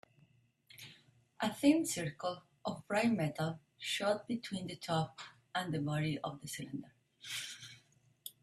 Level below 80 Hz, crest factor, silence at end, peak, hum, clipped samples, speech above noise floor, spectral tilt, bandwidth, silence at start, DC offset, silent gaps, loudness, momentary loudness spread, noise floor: -74 dBFS; 22 dB; 0.1 s; -16 dBFS; none; under 0.1%; 34 dB; -5 dB/octave; 14.5 kHz; 0.75 s; under 0.1%; none; -37 LUFS; 19 LU; -70 dBFS